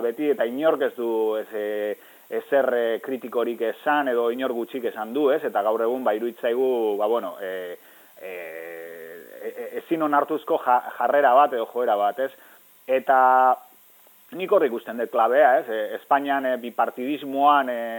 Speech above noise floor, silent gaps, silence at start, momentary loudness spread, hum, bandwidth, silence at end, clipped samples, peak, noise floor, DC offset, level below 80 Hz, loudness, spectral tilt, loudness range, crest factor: 31 dB; none; 0 s; 17 LU; none; 17.5 kHz; 0 s; under 0.1%; -4 dBFS; -53 dBFS; under 0.1%; -84 dBFS; -23 LUFS; -5 dB/octave; 7 LU; 18 dB